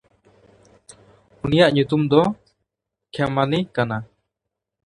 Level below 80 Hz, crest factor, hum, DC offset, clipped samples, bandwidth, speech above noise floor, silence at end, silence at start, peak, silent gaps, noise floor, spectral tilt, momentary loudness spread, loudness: -52 dBFS; 22 dB; none; under 0.1%; under 0.1%; 11 kHz; 64 dB; 0.8 s; 1.45 s; 0 dBFS; none; -83 dBFS; -7 dB/octave; 14 LU; -20 LUFS